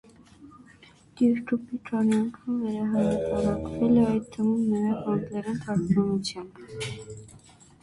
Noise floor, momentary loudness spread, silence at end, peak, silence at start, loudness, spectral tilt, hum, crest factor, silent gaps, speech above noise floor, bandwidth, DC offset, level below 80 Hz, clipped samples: -54 dBFS; 12 LU; 0.45 s; -12 dBFS; 0.4 s; -26 LUFS; -7 dB/octave; none; 16 dB; none; 28 dB; 11.5 kHz; under 0.1%; -52 dBFS; under 0.1%